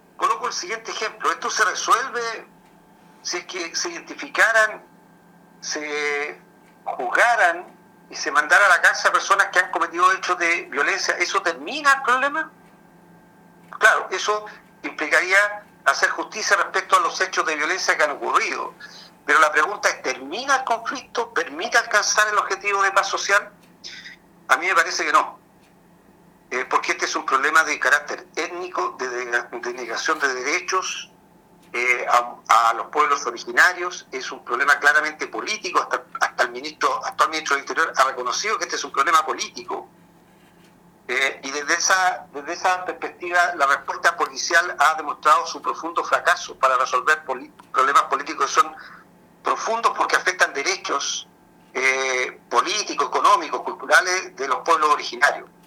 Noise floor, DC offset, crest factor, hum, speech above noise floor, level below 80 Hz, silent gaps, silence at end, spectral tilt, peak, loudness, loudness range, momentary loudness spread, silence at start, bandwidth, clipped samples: -53 dBFS; under 0.1%; 22 dB; none; 32 dB; -70 dBFS; none; 0.2 s; -0.5 dB/octave; 0 dBFS; -20 LUFS; 5 LU; 12 LU; 0.2 s; 18.5 kHz; under 0.1%